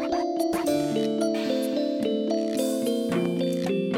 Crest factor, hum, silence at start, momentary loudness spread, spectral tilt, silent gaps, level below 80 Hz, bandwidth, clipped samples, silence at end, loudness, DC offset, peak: 12 dB; none; 0 s; 1 LU; -5.5 dB/octave; none; -62 dBFS; 17 kHz; under 0.1%; 0 s; -26 LUFS; under 0.1%; -12 dBFS